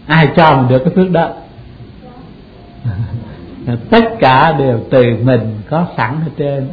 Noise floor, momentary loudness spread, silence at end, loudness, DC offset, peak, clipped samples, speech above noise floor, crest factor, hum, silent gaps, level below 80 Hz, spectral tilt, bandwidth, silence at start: -36 dBFS; 15 LU; 0 s; -12 LUFS; under 0.1%; 0 dBFS; 0.1%; 24 dB; 12 dB; none; none; -40 dBFS; -9.5 dB/octave; 5.4 kHz; 0.05 s